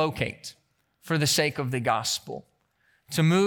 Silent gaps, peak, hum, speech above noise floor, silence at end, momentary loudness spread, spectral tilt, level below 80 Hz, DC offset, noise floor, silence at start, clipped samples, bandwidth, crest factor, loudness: none; -10 dBFS; none; 43 dB; 0 s; 18 LU; -4.5 dB/octave; -62 dBFS; under 0.1%; -68 dBFS; 0 s; under 0.1%; 19 kHz; 18 dB; -26 LUFS